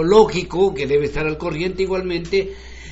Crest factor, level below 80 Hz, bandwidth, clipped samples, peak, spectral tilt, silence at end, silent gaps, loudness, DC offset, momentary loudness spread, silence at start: 18 dB; -36 dBFS; 8 kHz; under 0.1%; -2 dBFS; -4.5 dB/octave; 0 s; none; -19 LUFS; under 0.1%; 8 LU; 0 s